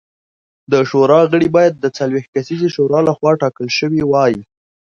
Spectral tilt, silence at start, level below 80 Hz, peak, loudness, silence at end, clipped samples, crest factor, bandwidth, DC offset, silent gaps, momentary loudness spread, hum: -6.5 dB/octave; 0.7 s; -54 dBFS; 0 dBFS; -14 LUFS; 0.45 s; under 0.1%; 14 dB; 7.4 kHz; under 0.1%; 2.28-2.33 s; 8 LU; none